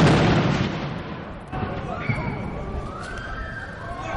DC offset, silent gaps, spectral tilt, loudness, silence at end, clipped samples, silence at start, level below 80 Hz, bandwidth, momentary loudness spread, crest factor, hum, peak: 0.2%; none; -6.5 dB/octave; -26 LUFS; 0 s; under 0.1%; 0 s; -38 dBFS; 11 kHz; 14 LU; 16 dB; none; -8 dBFS